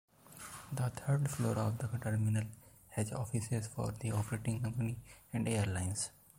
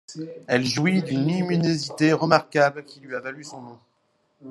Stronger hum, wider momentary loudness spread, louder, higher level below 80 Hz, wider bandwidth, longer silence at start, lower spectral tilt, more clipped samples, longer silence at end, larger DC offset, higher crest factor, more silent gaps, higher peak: neither; second, 12 LU vs 18 LU; second, -37 LUFS vs -22 LUFS; first, -62 dBFS vs -68 dBFS; first, 16.5 kHz vs 12 kHz; first, 0.25 s vs 0.1 s; about the same, -6 dB/octave vs -5.5 dB/octave; neither; first, 0.3 s vs 0 s; neither; second, 16 dB vs 22 dB; neither; second, -20 dBFS vs 0 dBFS